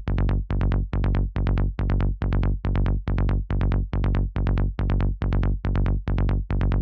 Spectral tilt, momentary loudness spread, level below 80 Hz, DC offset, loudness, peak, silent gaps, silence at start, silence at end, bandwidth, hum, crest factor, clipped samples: -10 dB/octave; 0 LU; -24 dBFS; under 0.1%; -25 LUFS; -8 dBFS; none; 0 s; 0 s; 4.8 kHz; none; 14 dB; under 0.1%